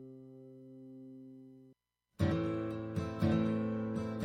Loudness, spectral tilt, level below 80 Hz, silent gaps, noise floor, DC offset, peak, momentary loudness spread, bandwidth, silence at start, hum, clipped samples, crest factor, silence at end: -35 LUFS; -8.5 dB/octave; -60 dBFS; none; -70 dBFS; under 0.1%; -20 dBFS; 21 LU; 10 kHz; 0 s; none; under 0.1%; 18 dB; 0 s